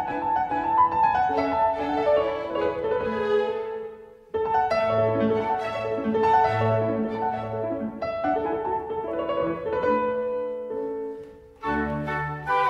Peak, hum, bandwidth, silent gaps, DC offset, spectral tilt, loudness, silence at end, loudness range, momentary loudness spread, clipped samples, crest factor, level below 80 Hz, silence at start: -10 dBFS; none; 7.8 kHz; none; under 0.1%; -7.5 dB/octave; -25 LUFS; 0 s; 4 LU; 10 LU; under 0.1%; 16 dB; -52 dBFS; 0 s